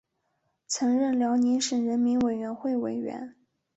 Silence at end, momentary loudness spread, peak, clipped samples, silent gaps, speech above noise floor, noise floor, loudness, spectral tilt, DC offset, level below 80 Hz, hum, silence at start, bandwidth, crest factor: 0.45 s; 10 LU; -16 dBFS; under 0.1%; none; 50 dB; -76 dBFS; -27 LUFS; -4 dB/octave; under 0.1%; -66 dBFS; none; 0.7 s; 8.2 kHz; 12 dB